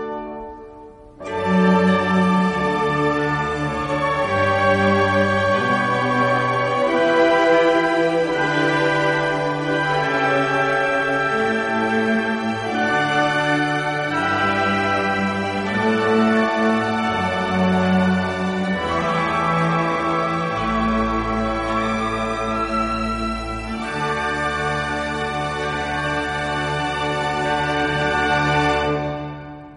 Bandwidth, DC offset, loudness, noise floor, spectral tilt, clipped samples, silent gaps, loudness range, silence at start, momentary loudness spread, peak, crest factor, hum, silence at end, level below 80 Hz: 11.5 kHz; under 0.1%; -19 LUFS; -41 dBFS; -6 dB/octave; under 0.1%; none; 5 LU; 0 s; 7 LU; -4 dBFS; 16 dB; none; 0 s; -40 dBFS